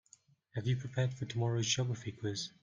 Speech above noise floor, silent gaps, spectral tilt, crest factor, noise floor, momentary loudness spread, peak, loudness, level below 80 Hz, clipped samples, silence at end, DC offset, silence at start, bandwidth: 31 dB; none; -4.5 dB/octave; 18 dB; -66 dBFS; 7 LU; -18 dBFS; -36 LUFS; -66 dBFS; under 0.1%; 0.15 s; under 0.1%; 0.55 s; 7.6 kHz